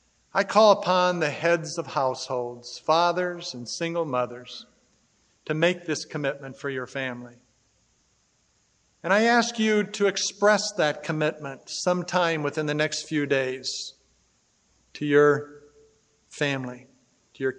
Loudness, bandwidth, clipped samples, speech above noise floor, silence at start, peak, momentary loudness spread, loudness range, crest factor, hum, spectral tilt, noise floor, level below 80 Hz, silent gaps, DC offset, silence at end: -25 LUFS; 9.6 kHz; under 0.1%; 42 dB; 0.35 s; -4 dBFS; 14 LU; 7 LU; 22 dB; none; -4 dB/octave; -67 dBFS; -74 dBFS; none; under 0.1%; 0 s